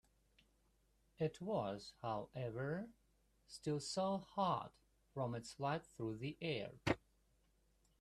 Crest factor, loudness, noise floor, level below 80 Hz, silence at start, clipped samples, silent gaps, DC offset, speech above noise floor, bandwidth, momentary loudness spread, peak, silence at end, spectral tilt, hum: 22 dB; -44 LUFS; -77 dBFS; -72 dBFS; 1.2 s; under 0.1%; none; under 0.1%; 34 dB; 13.5 kHz; 8 LU; -22 dBFS; 1.05 s; -5.5 dB/octave; none